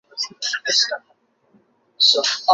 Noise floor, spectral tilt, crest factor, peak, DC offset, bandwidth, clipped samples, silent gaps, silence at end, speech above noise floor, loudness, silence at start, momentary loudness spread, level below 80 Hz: -59 dBFS; 2 dB/octave; 20 dB; -2 dBFS; under 0.1%; 8 kHz; under 0.1%; none; 0 s; 40 dB; -18 LUFS; 0.15 s; 12 LU; -82 dBFS